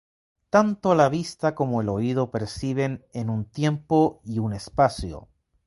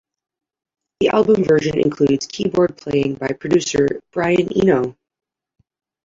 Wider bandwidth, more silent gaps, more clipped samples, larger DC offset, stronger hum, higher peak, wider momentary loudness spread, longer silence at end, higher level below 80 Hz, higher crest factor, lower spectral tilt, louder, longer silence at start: first, 11.5 kHz vs 7.8 kHz; neither; neither; neither; neither; about the same, -4 dBFS vs -4 dBFS; first, 9 LU vs 6 LU; second, 0.4 s vs 1.1 s; about the same, -48 dBFS vs -50 dBFS; about the same, 20 dB vs 16 dB; first, -7 dB/octave vs -5.5 dB/octave; second, -24 LUFS vs -18 LUFS; second, 0.55 s vs 1 s